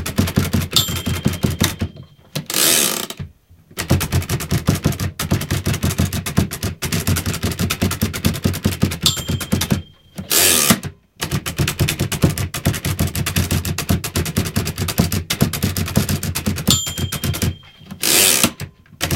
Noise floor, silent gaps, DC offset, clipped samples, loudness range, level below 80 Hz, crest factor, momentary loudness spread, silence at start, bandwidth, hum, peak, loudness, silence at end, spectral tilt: -47 dBFS; none; under 0.1%; under 0.1%; 3 LU; -34 dBFS; 20 dB; 11 LU; 0 s; 17 kHz; none; 0 dBFS; -18 LUFS; 0 s; -3.5 dB/octave